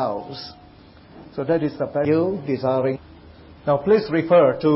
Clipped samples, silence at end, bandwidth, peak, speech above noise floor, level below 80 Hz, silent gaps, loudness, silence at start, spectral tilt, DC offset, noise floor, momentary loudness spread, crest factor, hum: under 0.1%; 0 s; 5.8 kHz; -6 dBFS; 27 dB; -54 dBFS; none; -21 LUFS; 0 s; -11.5 dB/octave; under 0.1%; -47 dBFS; 18 LU; 16 dB; none